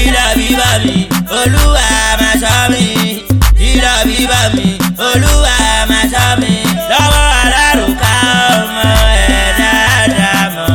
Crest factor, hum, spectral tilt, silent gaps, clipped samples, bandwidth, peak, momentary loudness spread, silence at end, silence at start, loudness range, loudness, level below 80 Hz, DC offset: 10 dB; none; -3.5 dB/octave; none; under 0.1%; 17.5 kHz; 0 dBFS; 4 LU; 0 s; 0 s; 1 LU; -9 LUFS; -16 dBFS; under 0.1%